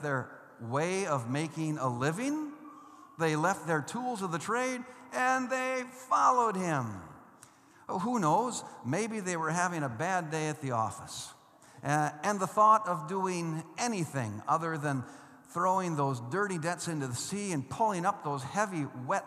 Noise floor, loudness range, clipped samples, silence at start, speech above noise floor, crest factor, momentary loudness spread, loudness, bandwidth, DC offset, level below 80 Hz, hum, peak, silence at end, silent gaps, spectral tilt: -58 dBFS; 3 LU; under 0.1%; 0 s; 26 dB; 20 dB; 11 LU; -32 LUFS; 14.5 kHz; under 0.1%; -78 dBFS; none; -12 dBFS; 0 s; none; -5 dB/octave